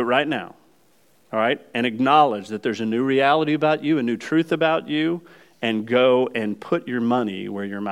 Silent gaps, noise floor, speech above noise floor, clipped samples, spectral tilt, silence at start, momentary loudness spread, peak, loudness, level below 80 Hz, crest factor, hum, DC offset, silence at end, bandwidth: none; -60 dBFS; 39 dB; under 0.1%; -6.5 dB/octave; 0 s; 11 LU; -4 dBFS; -21 LUFS; -74 dBFS; 18 dB; none; under 0.1%; 0 s; 11.5 kHz